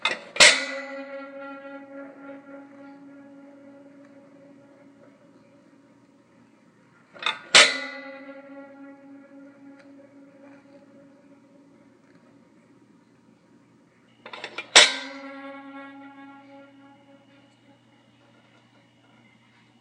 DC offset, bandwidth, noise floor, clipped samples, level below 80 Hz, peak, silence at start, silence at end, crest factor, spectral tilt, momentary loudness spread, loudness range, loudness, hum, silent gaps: under 0.1%; 10.5 kHz; -58 dBFS; under 0.1%; -74 dBFS; 0 dBFS; 0.05 s; 3.95 s; 30 dB; 1 dB/octave; 31 LU; 22 LU; -18 LUFS; none; none